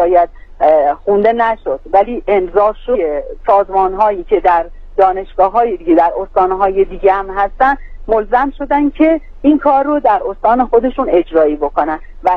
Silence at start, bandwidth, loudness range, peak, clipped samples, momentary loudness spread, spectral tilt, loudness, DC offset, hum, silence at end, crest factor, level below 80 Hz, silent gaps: 0 s; 5.8 kHz; 1 LU; 0 dBFS; under 0.1%; 5 LU; -8 dB/octave; -13 LUFS; under 0.1%; none; 0 s; 12 dB; -32 dBFS; none